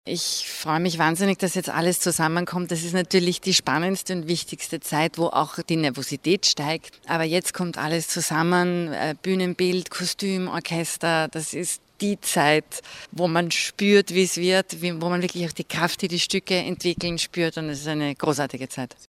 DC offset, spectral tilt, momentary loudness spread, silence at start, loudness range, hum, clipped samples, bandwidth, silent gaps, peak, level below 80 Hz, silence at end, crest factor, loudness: under 0.1%; -4 dB/octave; 8 LU; 0.05 s; 3 LU; none; under 0.1%; 16 kHz; none; -4 dBFS; -60 dBFS; 0.15 s; 20 dB; -23 LUFS